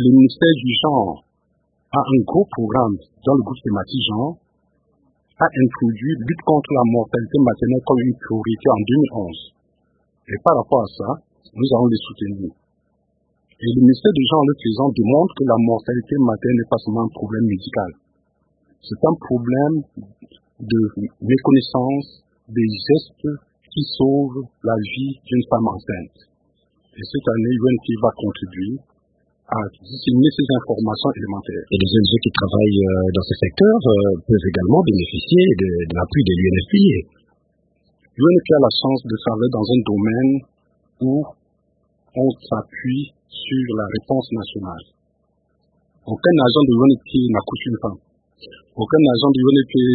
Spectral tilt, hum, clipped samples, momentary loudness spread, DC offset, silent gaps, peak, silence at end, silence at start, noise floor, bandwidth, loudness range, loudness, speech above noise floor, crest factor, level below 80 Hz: -11.5 dB/octave; none; under 0.1%; 13 LU; under 0.1%; none; 0 dBFS; 0 s; 0 s; -66 dBFS; 4.8 kHz; 6 LU; -18 LUFS; 49 dB; 18 dB; -48 dBFS